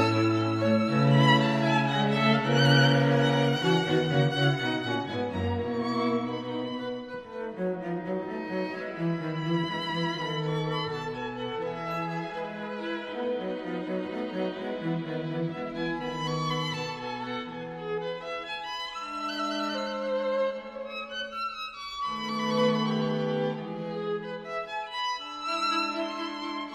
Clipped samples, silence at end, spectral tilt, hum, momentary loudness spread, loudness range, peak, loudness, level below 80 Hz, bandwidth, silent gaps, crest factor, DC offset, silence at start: under 0.1%; 0 s; -6 dB/octave; none; 11 LU; 10 LU; -10 dBFS; -29 LUFS; -62 dBFS; 10.5 kHz; none; 20 dB; under 0.1%; 0 s